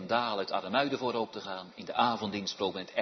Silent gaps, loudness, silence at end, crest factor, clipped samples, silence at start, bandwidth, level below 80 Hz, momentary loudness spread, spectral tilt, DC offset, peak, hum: none; -32 LUFS; 0 s; 20 dB; under 0.1%; 0 s; 6.2 kHz; -76 dBFS; 9 LU; -2 dB/octave; under 0.1%; -12 dBFS; none